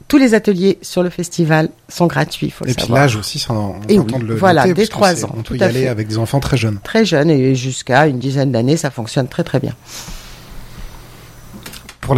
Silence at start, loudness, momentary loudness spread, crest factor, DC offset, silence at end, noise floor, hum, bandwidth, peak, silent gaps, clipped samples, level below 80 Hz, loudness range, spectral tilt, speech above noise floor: 0.1 s; -15 LUFS; 17 LU; 16 dB; under 0.1%; 0 s; -37 dBFS; none; 16 kHz; 0 dBFS; none; under 0.1%; -40 dBFS; 5 LU; -5.5 dB/octave; 22 dB